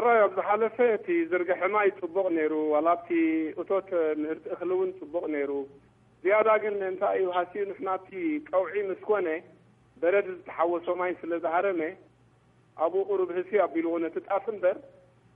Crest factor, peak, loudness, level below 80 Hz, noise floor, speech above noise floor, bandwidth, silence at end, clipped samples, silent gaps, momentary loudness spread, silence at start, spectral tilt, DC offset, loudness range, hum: 16 dB; -12 dBFS; -28 LUFS; -74 dBFS; -62 dBFS; 34 dB; 3.8 kHz; 0.55 s; under 0.1%; none; 8 LU; 0 s; -8.5 dB/octave; under 0.1%; 4 LU; none